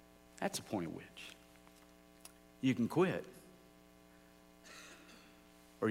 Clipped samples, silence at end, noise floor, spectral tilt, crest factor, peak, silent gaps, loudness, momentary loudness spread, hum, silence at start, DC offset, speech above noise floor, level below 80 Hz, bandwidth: under 0.1%; 0 s; -63 dBFS; -5.5 dB/octave; 20 dB; -22 dBFS; none; -38 LUFS; 27 LU; none; 0.4 s; under 0.1%; 25 dB; -72 dBFS; 16 kHz